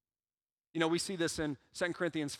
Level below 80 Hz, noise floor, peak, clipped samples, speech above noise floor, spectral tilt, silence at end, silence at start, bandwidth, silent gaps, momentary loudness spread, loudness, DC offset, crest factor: -64 dBFS; under -90 dBFS; -16 dBFS; under 0.1%; over 55 dB; -4 dB/octave; 0 s; 0.75 s; 15.5 kHz; none; 6 LU; -35 LUFS; under 0.1%; 22 dB